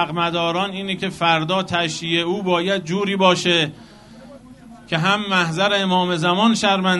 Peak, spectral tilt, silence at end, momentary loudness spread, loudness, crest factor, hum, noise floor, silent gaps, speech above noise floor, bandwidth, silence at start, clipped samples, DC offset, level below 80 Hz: -2 dBFS; -4.5 dB/octave; 0 s; 6 LU; -19 LUFS; 18 dB; none; -42 dBFS; none; 23 dB; 11.5 kHz; 0 s; under 0.1%; under 0.1%; -56 dBFS